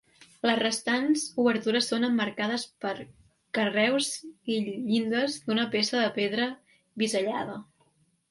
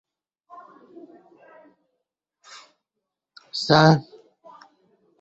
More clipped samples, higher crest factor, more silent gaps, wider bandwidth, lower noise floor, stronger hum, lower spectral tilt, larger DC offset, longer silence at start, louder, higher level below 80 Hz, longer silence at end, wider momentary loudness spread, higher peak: neither; second, 18 dB vs 24 dB; neither; first, 11.5 kHz vs 8 kHz; second, -68 dBFS vs -84 dBFS; neither; second, -3.5 dB/octave vs -6 dB/octave; neither; second, 0.45 s vs 3.55 s; second, -28 LUFS vs -19 LUFS; second, -72 dBFS vs -60 dBFS; second, 0.65 s vs 1.2 s; second, 10 LU vs 30 LU; second, -10 dBFS vs -2 dBFS